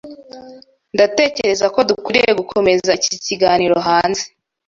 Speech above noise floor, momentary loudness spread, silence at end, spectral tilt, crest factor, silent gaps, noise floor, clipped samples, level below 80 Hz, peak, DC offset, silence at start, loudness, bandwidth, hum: 25 dB; 9 LU; 0.4 s; -3 dB/octave; 16 dB; none; -40 dBFS; under 0.1%; -52 dBFS; 0 dBFS; under 0.1%; 0.05 s; -15 LUFS; 7.8 kHz; none